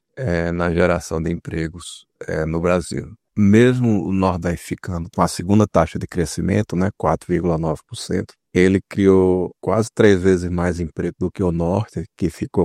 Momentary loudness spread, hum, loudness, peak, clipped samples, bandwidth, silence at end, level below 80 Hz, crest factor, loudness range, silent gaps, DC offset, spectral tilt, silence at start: 12 LU; none; -19 LUFS; 0 dBFS; under 0.1%; 14 kHz; 0 s; -44 dBFS; 18 dB; 3 LU; none; under 0.1%; -7 dB/octave; 0.15 s